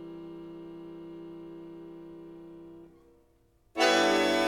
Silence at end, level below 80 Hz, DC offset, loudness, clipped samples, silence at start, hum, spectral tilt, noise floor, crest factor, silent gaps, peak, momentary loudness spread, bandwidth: 0 s; -64 dBFS; under 0.1%; -25 LUFS; under 0.1%; 0 s; none; -3 dB/octave; -66 dBFS; 20 dB; none; -12 dBFS; 24 LU; 16.5 kHz